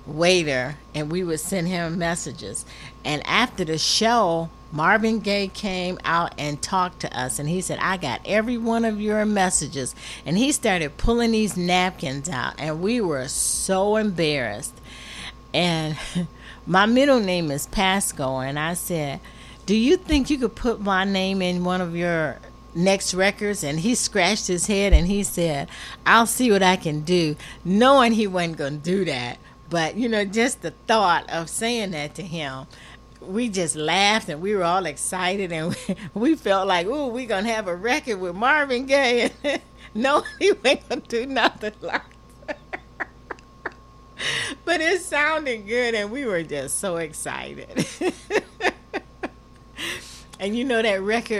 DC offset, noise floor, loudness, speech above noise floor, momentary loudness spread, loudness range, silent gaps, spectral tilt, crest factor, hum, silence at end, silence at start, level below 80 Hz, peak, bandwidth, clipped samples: under 0.1%; -47 dBFS; -22 LUFS; 25 dB; 13 LU; 5 LU; none; -4 dB/octave; 22 dB; none; 0 s; 0 s; -38 dBFS; -2 dBFS; 15.5 kHz; under 0.1%